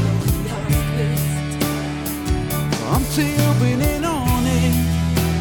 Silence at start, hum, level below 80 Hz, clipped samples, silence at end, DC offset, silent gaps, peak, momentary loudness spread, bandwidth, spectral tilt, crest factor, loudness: 0 s; none; -28 dBFS; under 0.1%; 0 s; under 0.1%; none; -6 dBFS; 5 LU; 19 kHz; -5.5 dB/octave; 12 dB; -20 LUFS